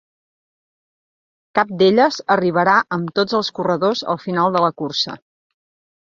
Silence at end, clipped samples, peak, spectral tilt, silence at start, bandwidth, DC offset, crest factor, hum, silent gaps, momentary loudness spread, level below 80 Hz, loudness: 0.95 s; under 0.1%; 0 dBFS; -5.5 dB/octave; 1.55 s; 7.4 kHz; under 0.1%; 20 dB; none; none; 7 LU; -64 dBFS; -18 LUFS